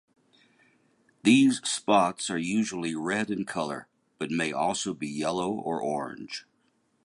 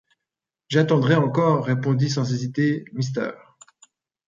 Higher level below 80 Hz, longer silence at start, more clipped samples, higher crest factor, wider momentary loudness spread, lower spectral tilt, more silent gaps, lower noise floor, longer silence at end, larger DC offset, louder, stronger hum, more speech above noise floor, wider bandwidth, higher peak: about the same, -68 dBFS vs -64 dBFS; first, 1.25 s vs 0.7 s; neither; about the same, 20 dB vs 18 dB; first, 14 LU vs 8 LU; second, -4 dB/octave vs -7 dB/octave; neither; second, -70 dBFS vs -86 dBFS; second, 0.65 s vs 0.95 s; neither; second, -27 LUFS vs -22 LUFS; neither; second, 43 dB vs 66 dB; first, 11.5 kHz vs 7.6 kHz; second, -8 dBFS vs -4 dBFS